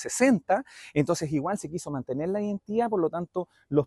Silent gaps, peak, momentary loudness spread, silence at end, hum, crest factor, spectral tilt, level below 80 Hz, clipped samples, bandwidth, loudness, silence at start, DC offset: none; -10 dBFS; 10 LU; 0 s; none; 18 dB; -6 dB/octave; -62 dBFS; under 0.1%; 12.5 kHz; -28 LUFS; 0 s; under 0.1%